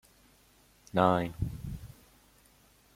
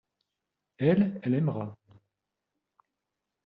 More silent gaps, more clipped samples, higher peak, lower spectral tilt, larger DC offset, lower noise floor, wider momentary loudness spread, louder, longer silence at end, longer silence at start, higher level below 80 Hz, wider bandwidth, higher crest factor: neither; neither; first, -8 dBFS vs -12 dBFS; second, -7 dB/octave vs -8.5 dB/octave; neither; second, -63 dBFS vs -86 dBFS; first, 19 LU vs 12 LU; second, -31 LUFS vs -28 LUFS; second, 1.05 s vs 1.7 s; first, 0.95 s vs 0.8 s; first, -52 dBFS vs -70 dBFS; first, 16.5 kHz vs 4.8 kHz; first, 26 dB vs 20 dB